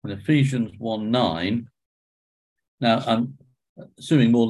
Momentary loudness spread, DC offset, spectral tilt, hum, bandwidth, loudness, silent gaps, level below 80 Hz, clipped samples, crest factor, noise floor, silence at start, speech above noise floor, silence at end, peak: 9 LU; under 0.1%; -7 dB/octave; none; 11.5 kHz; -23 LUFS; 1.86-2.56 s, 2.68-2.78 s, 3.69-3.76 s; -56 dBFS; under 0.1%; 16 dB; under -90 dBFS; 0.05 s; over 69 dB; 0 s; -6 dBFS